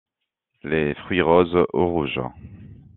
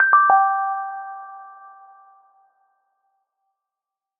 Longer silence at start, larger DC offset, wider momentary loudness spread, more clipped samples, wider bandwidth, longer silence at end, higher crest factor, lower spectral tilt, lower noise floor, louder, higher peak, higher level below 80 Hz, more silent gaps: first, 0.65 s vs 0 s; neither; second, 12 LU vs 26 LU; neither; first, 4.2 kHz vs 2.7 kHz; second, 0.2 s vs 2.7 s; about the same, 20 dB vs 20 dB; first, -5 dB/octave vs -0.5 dB/octave; second, -80 dBFS vs -87 dBFS; second, -21 LUFS vs -18 LUFS; about the same, -2 dBFS vs -2 dBFS; first, -50 dBFS vs -74 dBFS; neither